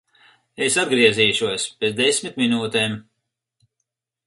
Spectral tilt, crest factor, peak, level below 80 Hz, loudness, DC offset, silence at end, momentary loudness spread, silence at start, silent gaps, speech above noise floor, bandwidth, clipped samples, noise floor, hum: -3 dB/octave; 20 dB; -2 dBFS; -62 dBFS; -19 LUFS; under 0.1%; 1.25 s; 9 LU; 0.6 s; none; 59 dB; 11.5 kHz; under 0.1%; -79 dBFS; none